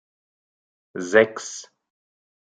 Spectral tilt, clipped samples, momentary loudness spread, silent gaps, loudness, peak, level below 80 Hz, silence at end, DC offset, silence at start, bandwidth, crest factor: -3.5 dB/octave; under 0.1%; 19 LU; none; -19 LUFS; -2 dBFS; -76 dBFS; 0.9 s; under 0.1%; 0.95 s; 9.4 kHz; 24 dB